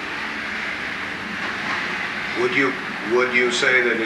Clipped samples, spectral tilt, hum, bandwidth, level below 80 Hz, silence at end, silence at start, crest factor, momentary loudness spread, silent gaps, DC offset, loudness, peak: under 0.1%; -3.5 dB/octave; none; 12 kHz; -56 dBFS; 0 s; 0 s; 18 dB; 10 LU; none; under 0.1%; -21 LUFS; -4 dBFS